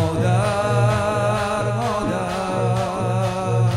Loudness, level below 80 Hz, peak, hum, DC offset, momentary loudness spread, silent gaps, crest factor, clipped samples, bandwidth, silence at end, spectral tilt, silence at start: -21 LUFS; -42 dBFS; -6 dBFS; none; under 0.1%; 4 LU; none; 12 dB; under 0.1%; 12 kHz; 0 s; -6.5 dB/octave; 0 s